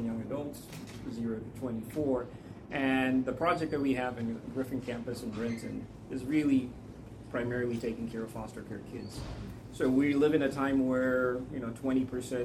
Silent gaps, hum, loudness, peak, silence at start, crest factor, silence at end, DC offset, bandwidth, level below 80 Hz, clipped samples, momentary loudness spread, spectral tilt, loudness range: none; none; -33 LUFS; -14 dBFS; 0 s; 18 dB; 0 s; under 0.1%; 14 kHz; -56 dBFS; under 0.1%; 15 LU; -6.5 dB/octave; 4 LU